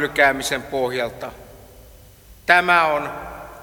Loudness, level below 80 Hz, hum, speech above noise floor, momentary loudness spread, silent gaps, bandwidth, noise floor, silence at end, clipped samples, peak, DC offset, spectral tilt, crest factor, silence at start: -19 LUFS; -48 dBFS; none; 27 dB; 20 LU; none; 19 kHz; -46 dBFS; 0 s; under 0.1%; -2 dBFS; under 0.1%; -3 dB/octave; 20 dB; 0 s